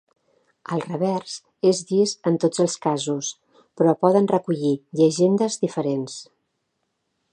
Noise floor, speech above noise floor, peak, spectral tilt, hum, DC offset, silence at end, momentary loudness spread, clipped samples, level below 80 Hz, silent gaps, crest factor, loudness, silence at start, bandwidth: -75 dBFS; 54 dB; -4 dBFS; -5.5 dB/octave; none; under 0.1%; 1.1 s; 11 LU; under 0.1%; -74 dBFS; none; 20 dB; -22 LUFS; 0.7 s; 10 kHz